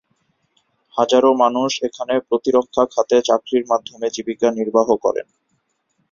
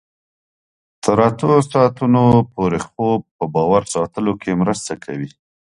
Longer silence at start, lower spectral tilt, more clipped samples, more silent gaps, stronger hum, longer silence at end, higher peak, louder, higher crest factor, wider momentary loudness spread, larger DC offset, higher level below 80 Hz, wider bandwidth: about the same, 0.95 s vs 1.05 s; second, -4 dB/octave vs -7 dB/octave; neither; second, none vs 3.31-3.39 s; neither; first, 0.9 s vs 0.5 s; about the same, -2 dBFS vs 0 dBFS; about the same, -18 LUFS vs -17 LUFS; about the same, 18 dB vs 18 dB; about the same, 9 LU vs 11 LU; neither; second, -60 dBFS vs -48 dBFS; second, 7.4 kHz vs 11.5 kHz